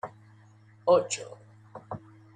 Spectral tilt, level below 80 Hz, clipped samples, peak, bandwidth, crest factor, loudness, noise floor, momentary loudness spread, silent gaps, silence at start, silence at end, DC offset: -4 dB/octave; -72 dBFS; under 0.1%; -10 dBFS; 9.6 kHz; 22 dB; -27 LUFS; -56 dBFS; 24 LU; none; 0.05 s; 0.4 s; under 0.1%